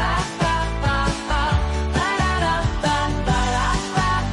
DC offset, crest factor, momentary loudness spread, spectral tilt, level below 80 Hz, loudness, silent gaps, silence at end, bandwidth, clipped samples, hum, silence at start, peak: under 0.1%; 12 dB; 2 LU; -5 dB/octave; -26 dBFS; -21 LUFS; none; 0 s; 11.5 kHz; under 0.1%; none; 0 s; -8 dBFS